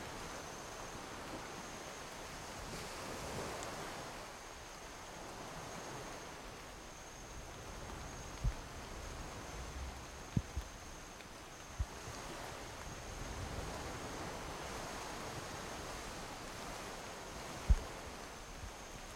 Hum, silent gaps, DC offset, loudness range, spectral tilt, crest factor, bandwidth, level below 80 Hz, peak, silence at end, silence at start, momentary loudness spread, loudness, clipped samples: none; none; under 0.1%; 4 LU; -4 dB/octave; 28 dB; 16.5 kHz; -48 dBFS; -18 dBFS; 0 s; 0 s; 7 LU; -46 LUFS; under 0.1%